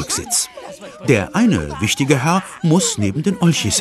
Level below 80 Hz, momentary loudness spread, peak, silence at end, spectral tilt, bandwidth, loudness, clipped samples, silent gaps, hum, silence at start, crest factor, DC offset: -44 dBFS; 8 LU; 0 dBFS; 0 s; -4.5 dB/octave; 13 kHz; -17 LUFS; under 0.1%; none; none; 0 s; 16 dB; under 0.1%